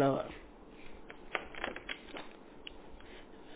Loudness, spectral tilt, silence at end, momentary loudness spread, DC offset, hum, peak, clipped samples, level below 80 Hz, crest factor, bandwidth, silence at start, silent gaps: -42 LUFS; -4 dB/octave; 0 s; 15 LU; under 0.1%; none; -18 dBFS; under 0.1%; -60 dBFS; 22 dB; 4 kHz; 0 s; none